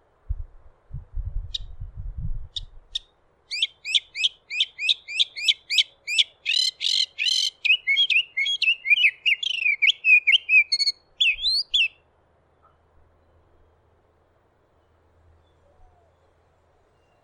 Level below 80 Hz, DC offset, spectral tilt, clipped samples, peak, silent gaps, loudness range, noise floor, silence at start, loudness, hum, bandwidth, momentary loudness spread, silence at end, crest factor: -42 dBFS; under 0.1%; 1 dB/octave; under 0.1%; -6 dBFS; none; 12 LU; -63 dBFS; 0.3 s; -20 LUFS; none; 14 kHz; 20 LU; 5.35 s; 20 dB